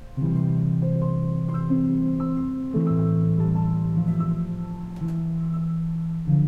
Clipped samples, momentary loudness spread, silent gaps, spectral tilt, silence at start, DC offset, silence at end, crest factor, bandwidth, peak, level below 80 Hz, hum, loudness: under 0.1%; 6 LU; none; -11.5 dB/octave; 0 s; under 0.1%; 0 s; 12 dB; 2.8 kHz; -10 dBFS; -42 dBFS; none; -24 LUFS